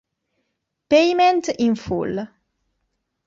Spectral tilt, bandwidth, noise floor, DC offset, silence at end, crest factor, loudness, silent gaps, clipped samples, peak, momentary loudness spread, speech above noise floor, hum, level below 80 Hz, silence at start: -5 dB/octave; 7.8 kHz; -75 dBFS; under 0.1%; 1 s; 18 dB; -19 LUFS; none; under 0.1%; -4 dBFS; 13 LU; 57 dB; none; -56 dBFS; 0.9 s